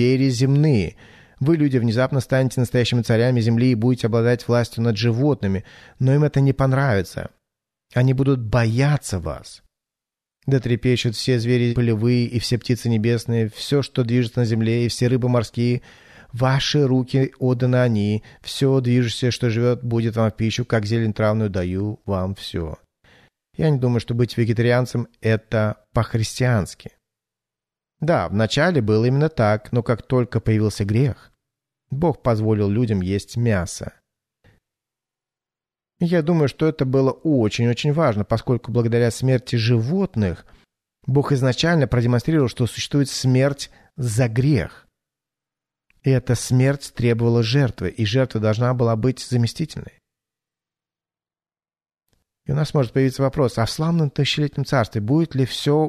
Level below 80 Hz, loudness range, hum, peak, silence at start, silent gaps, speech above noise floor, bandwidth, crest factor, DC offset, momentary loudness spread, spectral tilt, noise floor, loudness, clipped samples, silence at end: -46 dBFS; 4 LU; none; -6 dBFS; 0 s; none; over 71 dB; 13.5 kHz; 14 dB; under 0.1%; 7 LU; -6.5 dB/octave; under -90 dBFS; -20 LUFS; under 0.1%; 0 s